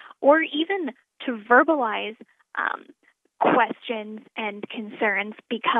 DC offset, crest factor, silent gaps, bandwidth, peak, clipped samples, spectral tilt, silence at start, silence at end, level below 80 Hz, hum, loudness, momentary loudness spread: under 0.1%; 20 dB; none; 4 kHz; -4 dBFS; under 0.1%; -7 dB/octave; 0.05 s; 0 s; -86 dBFS; none; -23 LUFS; 16 LU